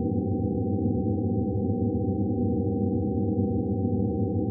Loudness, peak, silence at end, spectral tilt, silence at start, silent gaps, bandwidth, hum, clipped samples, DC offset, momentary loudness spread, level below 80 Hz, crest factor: -27 LUFS; -14 dBFS; 0 s; -18 dB/octave; 0 s; none; 0.9 kHz; none; under 0.1%; under 0.1%; 1 LU; -46 dBFS; 12 dB